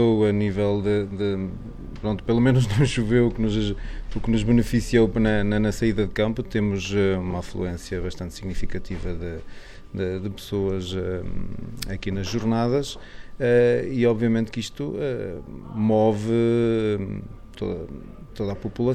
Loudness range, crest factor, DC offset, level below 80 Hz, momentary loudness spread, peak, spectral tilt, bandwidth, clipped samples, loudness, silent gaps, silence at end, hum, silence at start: 8 LU; 16 dB; under 0.1%; -36 dBFS; 14 LU; -8 dBFS; -7 dB/octave; 14.5 kHz; under 0.1%; -24 LUFS; none; 0 s; none; 0 s